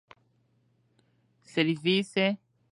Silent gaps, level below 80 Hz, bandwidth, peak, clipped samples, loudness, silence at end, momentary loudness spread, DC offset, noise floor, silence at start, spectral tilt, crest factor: none; -78 dBFS; 11.5 kHz; -12 dBFS; under 0.1%; -28 LUFS; 0.35 s; 9 LU; under 0.1%; -69 dBFS; 1.55 s; -5.5 dB/octave; 20 dB